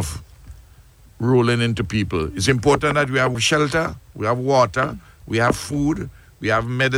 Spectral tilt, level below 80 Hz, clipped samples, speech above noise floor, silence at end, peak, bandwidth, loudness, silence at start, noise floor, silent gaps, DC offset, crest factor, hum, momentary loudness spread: -5 dB/octave; -40 dBFS; under 0.1%; 29 dB; 0 s; -2 dBFS; 16.5 kHz; -20 LUFS; 0 s; -48 dBFS; none; under 0.1%; 18 dB; none; 11 LU